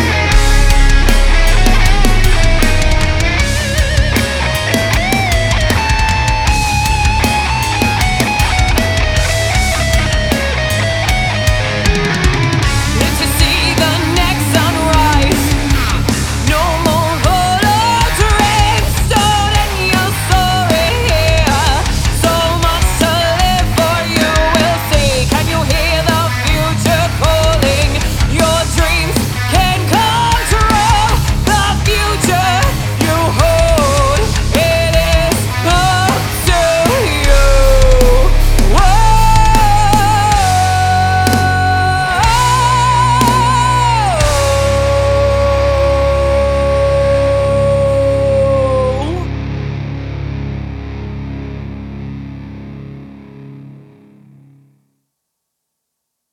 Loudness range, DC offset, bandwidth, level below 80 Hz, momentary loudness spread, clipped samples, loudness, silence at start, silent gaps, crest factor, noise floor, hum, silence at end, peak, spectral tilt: 2 LU; under 0.1%; 19 kHz; -16 dBFS; 4 LU; under 0.1%; -12 LUFS; 0 s; none; 12 dB; -74 dBFS; none; 2.6 s; 0 dBFS; -4.5 dB/octave